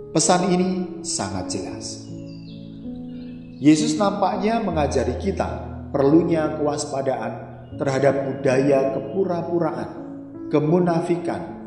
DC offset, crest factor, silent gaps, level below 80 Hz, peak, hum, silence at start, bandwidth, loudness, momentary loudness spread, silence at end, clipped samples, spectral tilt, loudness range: under 0.1%; 18 dB; none; -46 dBFS; -2 dBFS; none; 0 s; 11.5 kHz; -22 LUFS; 17 LU; 0 s; under 0.1%; -5.5 dB/octave; 3 LU